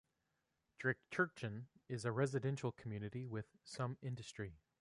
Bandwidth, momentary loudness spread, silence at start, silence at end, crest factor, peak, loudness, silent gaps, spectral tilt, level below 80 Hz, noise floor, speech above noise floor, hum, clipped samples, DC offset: 11.5 kHz; 11 LU; 0.8 s; 0.25 s; 20 dB; -24 dBFS; -44 LUFS; none; -6 dB/octave; -72 dBFS; -86 dBFS; 44 dB; none; under 0.1%; under 0.1%